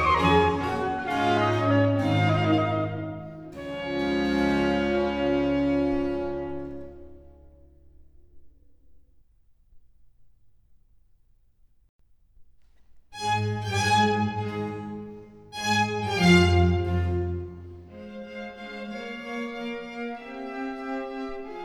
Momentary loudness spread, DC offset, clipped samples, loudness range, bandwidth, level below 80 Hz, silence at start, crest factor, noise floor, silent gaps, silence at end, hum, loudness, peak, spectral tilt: 18 LU; under 0.1%; under 0.1%; 11 LU; 14 kHz; -46 dBFS; 0 s; 20 dB; -60 dBFS; 11.89-11.99 s; 0 s; none; -25 LUFS; -6 dBFS; -6 dB/octave